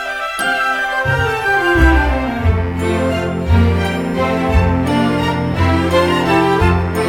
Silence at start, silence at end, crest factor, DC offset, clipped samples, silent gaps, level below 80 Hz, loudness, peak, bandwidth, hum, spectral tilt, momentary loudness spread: 0 s; 0 s; 14 dB; under 0.1%; under 0.1%; none; -22 dBFS; -15 LUFS; 0 dBFS; 16 kHz; none; -6.5 dB/octave; 5 LU